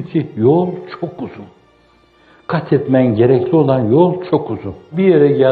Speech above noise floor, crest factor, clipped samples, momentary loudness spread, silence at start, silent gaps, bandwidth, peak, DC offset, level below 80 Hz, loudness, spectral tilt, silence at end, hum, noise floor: 37 dB; 14 dB; under 0.1%; 14 LU; 0 s; none; 4.7 kHz; 0 dBFS; under 0.1%; -54 dBFS; -14 LUFS; -11 dB/octave; 0 s; none; -51 dBFS